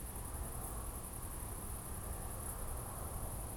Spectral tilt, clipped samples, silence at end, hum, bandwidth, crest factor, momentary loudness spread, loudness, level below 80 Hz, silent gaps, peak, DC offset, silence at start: -4.5 dB/octave; under 0.1%; 0 s; none; over 20 kHz; 12 dB; 1 LU; -45 LUFS; -46 dBFS; none; -32 dBFS; under 0.1%; 0 s